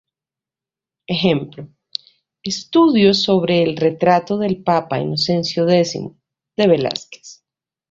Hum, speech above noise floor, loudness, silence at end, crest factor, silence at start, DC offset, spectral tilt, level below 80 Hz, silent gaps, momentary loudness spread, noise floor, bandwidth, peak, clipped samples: none; 72 dB; -17 LUFS; 0.55 s; 16 dB; 1.1 s; under 0.1%; -5.5 dB/octave; -58 dBFS; none; 17 LU; -89 dBFS; 7.6 kHz; -2 dBFS; under 0.1%